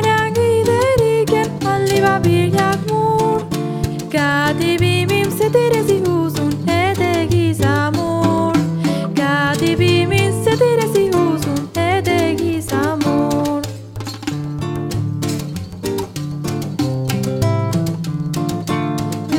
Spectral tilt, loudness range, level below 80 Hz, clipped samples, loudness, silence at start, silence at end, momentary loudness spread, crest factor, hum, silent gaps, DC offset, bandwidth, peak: -6 dB/octave; 6 LU; -42 dBFS; under 0.1%; -17 LUFS; 0 s; 0 s; 9 LU; 16 dB; none; none; under 0.1%; 17.5 kHz; -2 dBFS